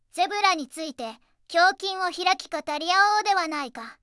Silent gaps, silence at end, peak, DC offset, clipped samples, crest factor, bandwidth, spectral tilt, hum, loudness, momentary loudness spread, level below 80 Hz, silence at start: none; 0.1 s; -6 dBFS; under 0.1%; under 0.1%; 20 dB; 12 kHz; 0 dB/octave; none; -24 LUFS; 14 LU; -72 dBFS; 0.15 s